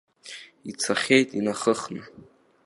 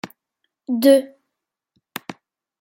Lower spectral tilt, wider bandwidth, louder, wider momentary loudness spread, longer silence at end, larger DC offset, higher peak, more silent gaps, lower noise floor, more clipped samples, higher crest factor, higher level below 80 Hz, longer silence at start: about the same, -3.5 dB/octave vs -4.5 dB/octave; second, 11.5 kHz vs 16.5 kHz; second, -23 LUFS vs -17 LUFS; second, 21 LU vs 25 LU; about the same, 0.45 s vs 0.5 s; neither; about the same, -4 dBFS vs -2 dBFS; neither; second, -45 dBFS vs -81 dBFS; neither; about the same, 22 dB vs 20 dB; first, -70 dBFS vs -76 dBFS; first, 0.25 s vs 0.05 s